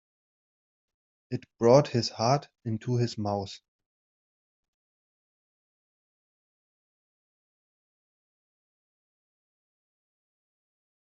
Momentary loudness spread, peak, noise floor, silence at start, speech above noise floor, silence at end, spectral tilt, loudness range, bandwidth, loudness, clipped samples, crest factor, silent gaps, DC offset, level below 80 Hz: 17 LU; -6 dBFS; under -90 dBFS; 1.3 s; over 64 dB; 7.55 s; -6 dB/octave; 12 LU; 7.4 kHz; -27 LUFS; under 0.1%; 26 dB; none; under 0.1%; -70 dBFS